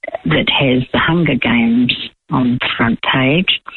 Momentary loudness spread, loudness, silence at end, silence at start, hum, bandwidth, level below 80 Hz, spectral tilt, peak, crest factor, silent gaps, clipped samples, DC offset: 4 LU; -14 LUFS; 0 s; 0.05 s; none; 4.3 kHz; -42 dBFS; -8.5 dB/octave; -2 dBFS; 12 dB; none; under 0.1%; under 0.1%